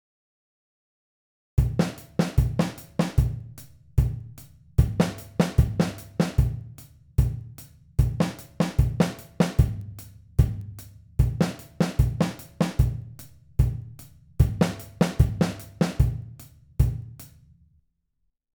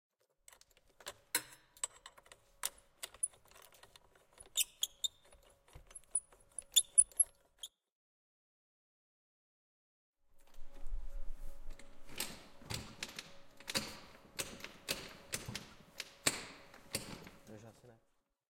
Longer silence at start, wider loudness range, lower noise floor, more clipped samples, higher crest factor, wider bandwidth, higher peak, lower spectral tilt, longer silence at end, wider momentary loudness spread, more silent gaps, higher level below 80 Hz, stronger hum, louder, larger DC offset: first, 1.55 s vs 1 s; second, 2 LU vs 17 LU; about the same, -75 dBFS vs -78 dBFS; neither; second, 22 dB vs 30 dB; first, over 20 kHz vs 16.5 kHz; first, -4 dBFS vs -14 dBFS; first, -7 dB/octave vs 0 dB/octave; first, 1.3 s vs 0.65 s; second, 19 LU vs 24 LU; second, none vs 7.92-10.13 s; first, -32 dBFS vs -54 dBFS; neither; first, -26 LUFS vs -37 LUFS; neither